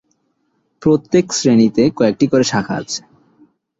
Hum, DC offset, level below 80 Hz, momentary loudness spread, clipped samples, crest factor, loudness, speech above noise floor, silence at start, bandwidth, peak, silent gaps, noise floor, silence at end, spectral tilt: none; under 0.1%; -52 dBFS; 10 LU; under 0.1%; 16 dB; -15 LUFS; 51 dB; 0.8 s; 7.8 kHz; -2 dBFS; none; -65 dBFS; 0.8 s; -5 dB/octave